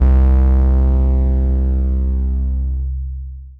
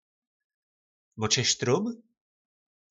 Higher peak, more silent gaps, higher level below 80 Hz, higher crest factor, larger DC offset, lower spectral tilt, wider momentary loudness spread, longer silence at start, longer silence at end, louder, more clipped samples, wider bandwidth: first, -2 dBFS vs -8 dBFS; neither; first, -14 dBFS vs -70 dBFS; second, 12 dB vs 24 dB; neither; first, -11.5 dB/octave vs -3 dB/octave; about the same, 11 LU vs 12 LU; second, 0 s vs 1.15 s; second, 0.05 s vs 0.95 s; first, -17 LUFS vs -26 LUFS; neither; second, 2.1 kHz vs 8.2 kHz